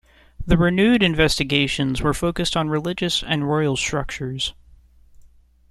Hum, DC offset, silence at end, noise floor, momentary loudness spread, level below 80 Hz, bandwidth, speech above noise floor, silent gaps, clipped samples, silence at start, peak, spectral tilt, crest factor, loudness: none; under 0.1%; 0.45 s; -51 dBFS; 10 LU; -36 dBFS; 14 kHz; 31 dB; none; under 0.1%; 0.4 s; -2 dBFS; -5 dB/octave; 20 dB; -20 LUFS